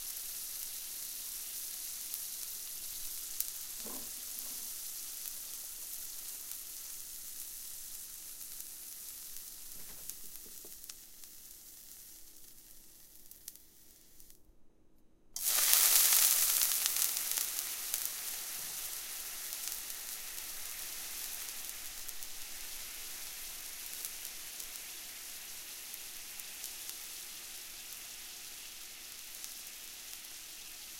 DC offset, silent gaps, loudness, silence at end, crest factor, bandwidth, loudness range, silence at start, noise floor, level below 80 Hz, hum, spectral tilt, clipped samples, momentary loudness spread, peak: under 0.1%; none; -36 LUFS; 0 s; 40 dB; 17 kHz; 20 LU; 0 s; -61 dBFS; -64 dBFS; none; 2.5 dB/octave; under 0.1%; 17 LU; 0 dBFS